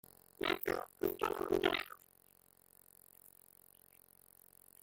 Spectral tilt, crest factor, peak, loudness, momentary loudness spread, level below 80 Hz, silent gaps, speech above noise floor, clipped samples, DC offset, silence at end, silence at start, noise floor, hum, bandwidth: -4 dB/octave; 24 dB; -18 dBFS; -38 LUFS; 26 LU; -68 dBFS; none; 31 dB; under 0.1%; under 0.1%; 2.85 s; 0.4 s; -68 dBFS; none; 17 kHz